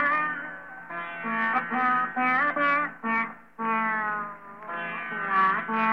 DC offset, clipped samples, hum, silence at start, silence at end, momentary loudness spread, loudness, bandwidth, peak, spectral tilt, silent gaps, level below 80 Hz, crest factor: 0.2%; under 0.1%; none; 0 s; 0 s; 13 LU; -26 LUFS; 6.4 kHz; -12 dBFS; -6.5 dB/octave; none; -74 dBFS; 16 dB